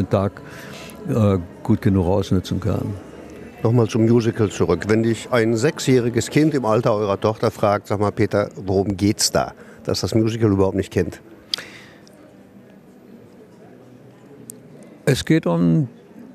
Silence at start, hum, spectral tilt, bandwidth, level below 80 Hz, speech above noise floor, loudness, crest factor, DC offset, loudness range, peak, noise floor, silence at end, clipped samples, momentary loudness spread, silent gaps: 0 s; none; -6 dB/octave; 14 kHz; -48 dBFS; 27 dB; -20 LUFS; 18 dB; under 0.1%; 8 LU; -2 dBFS; -45 dBFS; 0 s; under 0.1%; 17 LU; none